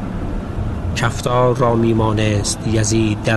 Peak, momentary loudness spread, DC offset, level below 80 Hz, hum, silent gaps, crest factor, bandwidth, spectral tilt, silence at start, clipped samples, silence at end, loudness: -2 dBFS; 10 LU; under 0.1%; -30 dBFS; none; none; 14 dB; 12 kHz; -5.5 dB/octave; 0 s; under 0.1%; 0 s; -17 LUFS